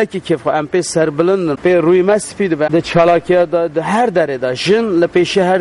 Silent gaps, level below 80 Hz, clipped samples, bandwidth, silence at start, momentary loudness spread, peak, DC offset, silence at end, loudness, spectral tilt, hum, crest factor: none; -48 dBFS; under 0.1%; 11.5 kHz; 0 s; 5 LU; -2 dBFS; under 0.1%; 0 s; -14 LUFS; -5.5 dB/octave; none; 12 dB